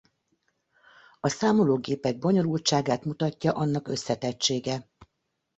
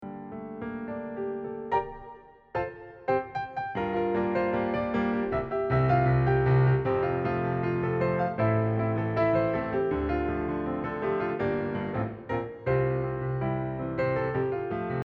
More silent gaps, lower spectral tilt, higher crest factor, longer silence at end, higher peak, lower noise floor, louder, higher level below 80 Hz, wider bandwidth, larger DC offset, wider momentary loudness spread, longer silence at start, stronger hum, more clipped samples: neither; second, -5 dB/octave vs -10 dB/octave; about the same, 18 dB vs 14 dB; first, 0.55 s vs 0.05 s; about the same, -10 dBFS vs -12 dBFS; first, -79 dBFS vs -49 dBFS; about the same, -26 LUFS vs -28 LUFS; second, -64 dBFS vs -48 dBFS; first, 8.2 kHz vs 5.2 kHz; neither; second, 7 LU vs 12 LU; first, 1.25 s vs 0 s; neither; neither